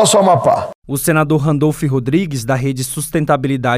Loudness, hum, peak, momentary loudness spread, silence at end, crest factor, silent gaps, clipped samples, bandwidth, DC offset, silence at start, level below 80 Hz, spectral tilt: -15 LUFS; none; 0 dBFS; 8 LU; 0 s; 14 dB; 0.75-0.82 s; under 0.1%; 16 kHz; under 0.1%; 0 s; -42 dBFS; -5 dB/octave